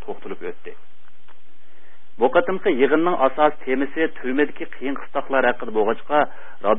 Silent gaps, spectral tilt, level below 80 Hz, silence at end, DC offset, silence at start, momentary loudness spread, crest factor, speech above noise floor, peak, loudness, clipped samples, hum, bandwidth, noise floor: none; -10 dB/octave; -58 dBFS; 0 s; 6%; 0.1 s; 15 LU; 20 dB; 37 dB; -2 dBFS; -21 LUFS; under 0.1%; none; 3.9 kHz; -58 dBFS